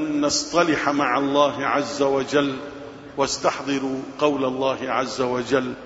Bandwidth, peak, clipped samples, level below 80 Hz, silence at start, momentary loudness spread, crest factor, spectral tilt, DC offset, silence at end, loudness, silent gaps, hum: 8 kHz; -4 dBFS; under 0.1%; -56 dBFS; 0 s; 7 LU; 18 dB; -3.5 dB/octave; under 0.1%; 0 s; -22 LUFS; none; none